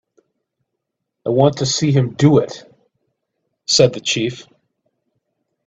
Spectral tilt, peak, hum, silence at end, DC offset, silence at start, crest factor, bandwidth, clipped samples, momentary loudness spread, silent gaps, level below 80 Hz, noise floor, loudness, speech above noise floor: -5 dB/octave; 0 dBFS; none; 1.25 s; under 0.1%; 1.25 s; 20 dB; 8.4 kHz; under 0.1%; 16 LU; none; -56 dBFS; -77 dBFS; -16 LUFS; 62 dB